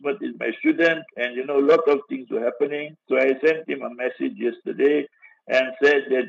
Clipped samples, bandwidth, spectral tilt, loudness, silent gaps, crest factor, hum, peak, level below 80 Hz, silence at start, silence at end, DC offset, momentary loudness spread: under 0.1%; 7.4 kHz; -5.5 dB/octave; -22 LUFS; none; 16 dB; none; -6 dBFS; -80 dBFS; 0.05 s; 0 s; under 0.1%; 10 LU